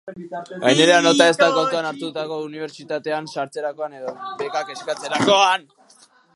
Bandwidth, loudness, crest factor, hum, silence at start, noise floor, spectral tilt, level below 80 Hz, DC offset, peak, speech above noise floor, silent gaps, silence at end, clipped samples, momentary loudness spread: 11.5 kHz; -19 LUFS; 20 dB; none; 0.05 s; -53 dBFS; -3 dB/octave; -72 dBFS; under 0.1%; 0 dBFS; 33 dB; none; 0.75 s; under 0.1%; 17 LU